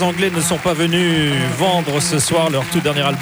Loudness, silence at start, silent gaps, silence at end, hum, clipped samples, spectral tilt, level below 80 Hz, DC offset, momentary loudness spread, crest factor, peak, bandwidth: -16 LUFS; 0 s; none; 0 s; none; under 0.1%; -4 dB/octave; -46 dBFS; under 0.1%; 2 LU; 12 dB; -4 dBFS; over 20 kHz